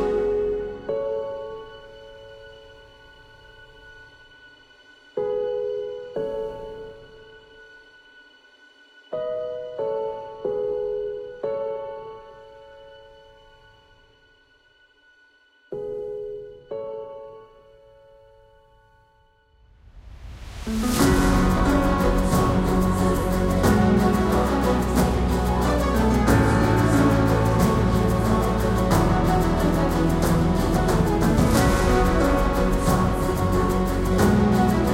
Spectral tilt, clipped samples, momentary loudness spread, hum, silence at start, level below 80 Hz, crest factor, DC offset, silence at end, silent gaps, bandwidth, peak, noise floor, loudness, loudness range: -6.5 dB/octave; under 0.1%; 17 LU; none; 0 s; -30 dBFS; 18 dB; under 0.1%; 0 s; none; 16 kHz; -4 dBFS; -59 dBFS; -22 LUFS; 18 LU